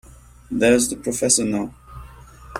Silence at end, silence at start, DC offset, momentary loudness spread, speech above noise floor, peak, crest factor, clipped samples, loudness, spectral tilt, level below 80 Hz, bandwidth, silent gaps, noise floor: 0 s; 0.5 s; under 0.1%; 12 LU; 23 dB; -4 dBFS; 20 dB; under 0.1%; -19 LUFS; -3 dB/octave; -46 dBFS; 16 kHz; none; -42 dBFS